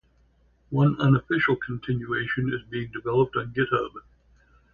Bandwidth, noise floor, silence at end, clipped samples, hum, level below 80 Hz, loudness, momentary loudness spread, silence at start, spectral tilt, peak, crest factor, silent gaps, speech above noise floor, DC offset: 4.9 kHz; -62 dBFS; 0.75 s; under 0.1%; none; -54 dBFS; -25 LUFS; 10 LU; 0.7 s; -9 dB/octave; -8 dBFS; 18 dB; none; 37 dB; under 0.1%